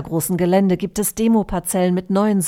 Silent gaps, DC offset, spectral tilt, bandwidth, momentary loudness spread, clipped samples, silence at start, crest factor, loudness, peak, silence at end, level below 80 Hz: none; under 0.1%; -6 dB/octave; 17 kHz; 5 LU; under 0.1%; 0 s; 14 dB; -18 LUFS; -4 dBFS; 0 s; -42 dBFS